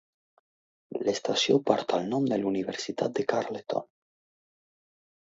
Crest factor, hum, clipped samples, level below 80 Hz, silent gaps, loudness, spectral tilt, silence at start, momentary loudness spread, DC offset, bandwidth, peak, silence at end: 24 dB; none; under 0.1%; -74 dBFS; none; -28 LUFS; -4.5 dB/octave; 0.9 s; 9 LU; under 0.1%; 7.8 kHz; -6 dBFS; 1.55 s